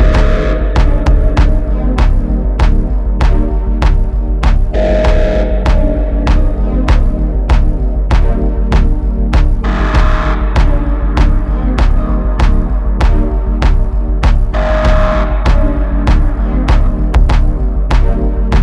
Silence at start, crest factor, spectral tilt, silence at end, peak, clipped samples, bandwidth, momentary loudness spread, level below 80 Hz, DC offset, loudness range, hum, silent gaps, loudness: 0 s; 10 dB; -7.5 dB/octave; 0 s; 0 dBFS; under 0.1%; 7 kHz; 4 LU; -10 dBFS; under 0.1%; 1 LU; none; none; -14 LUFS